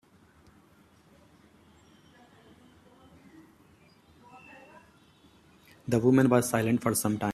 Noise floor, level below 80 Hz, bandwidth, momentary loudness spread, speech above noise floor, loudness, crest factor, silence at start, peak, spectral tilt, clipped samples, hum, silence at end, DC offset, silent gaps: -60 dBFS; -66 dBFS; 15.5 kHz; 28 LU; 36 dB; -25 LUFS; 22 dB; 4.35 s; -10 dBFS; -6 dB/octave; under 0.1%; none; 0 s; under 0.1%; none